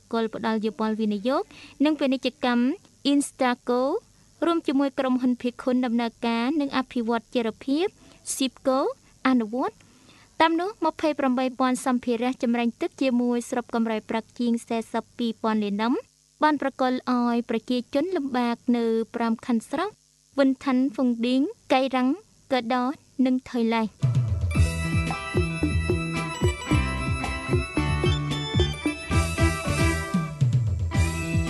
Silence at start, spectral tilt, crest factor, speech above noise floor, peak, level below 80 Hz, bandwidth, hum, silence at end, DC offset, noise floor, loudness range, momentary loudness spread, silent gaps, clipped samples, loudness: 0.1 s; -6 dB/octave; 18 dB; 30 dB; -6 dBFS; -38 dBFS; 12 kHz; none; 0 s; under 0.1%; -54 dBFS; 2 LU; 5 LU; none; under 0.1%; -25 LUFS